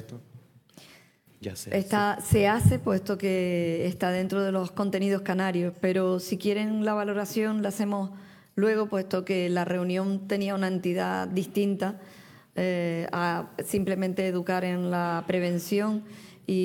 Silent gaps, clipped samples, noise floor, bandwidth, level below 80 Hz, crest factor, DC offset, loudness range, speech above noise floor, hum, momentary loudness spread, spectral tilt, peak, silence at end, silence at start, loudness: none; under 0.1%; -57 dBFS; 18 kHz; -58 dBFS; 20 dB; under 0.1%; 3 LU; 30 dB; none; 7 LU; -6 dB/octave; -8 dBFS; 0 s; 0 s; -28 LUFS